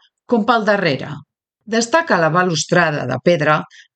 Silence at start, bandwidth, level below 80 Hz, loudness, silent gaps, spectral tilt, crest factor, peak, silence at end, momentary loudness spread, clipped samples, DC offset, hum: 0.3 s; 9.2 kHz; -62 dBFS; -16 LUFS; none; -4.5 dB/octave; 18 dB; 0 dBFS; 0.3 s; 7 LU; under 0.1%; under 0.1%; none